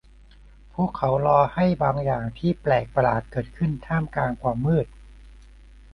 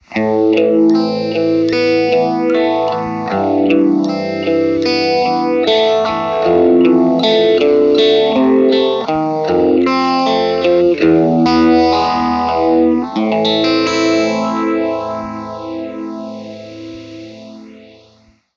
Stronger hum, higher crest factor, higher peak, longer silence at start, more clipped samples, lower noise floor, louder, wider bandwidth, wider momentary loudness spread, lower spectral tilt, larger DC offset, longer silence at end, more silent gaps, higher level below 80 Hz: first, 50 Hz at -45 dBFS vs none; first, 20 dB vs 14 dB; second, -6 dBFS vs 0 dBFS; first, 0.75 s vs 0.1 s; neither; about the same, -49 dBFS vs -50 dBFS; second, -24 LUFS vs -13 LUFS; second, 6 kHz vs 7.4 kHz; second, 8 LU vs 14 LU; first, -9.5 dB/octave vs -6 dB/octave; neither; second, 0.6 s vs 0.8 s; neither; first, -44 dBFS vs -50 dBFS